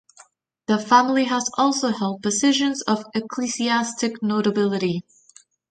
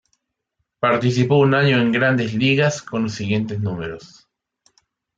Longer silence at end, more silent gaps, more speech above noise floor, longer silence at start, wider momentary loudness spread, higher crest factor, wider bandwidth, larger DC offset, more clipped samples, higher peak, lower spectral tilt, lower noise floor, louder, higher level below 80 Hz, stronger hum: second, 0.7 s vs 1.1 s; neither; second, 33 dB vs 57 dB; about the same, 0.7 s vs 0.8 s; about the same, 9 LU vs 10 LU; about the same, 20 dB vs 16 dB; first, 9.4 kHz vs 7.8 kHz; neither; neither; about the same, -2 dBFS vs -4 dBFS; second, -3.5 dB/octave vs -6 dB/octave; second, -54 dBFS vs -75 dBFS; about the same, -21 LUFS vs -19 LUFS; second, -64 dBFS vs -58 dBFS; neither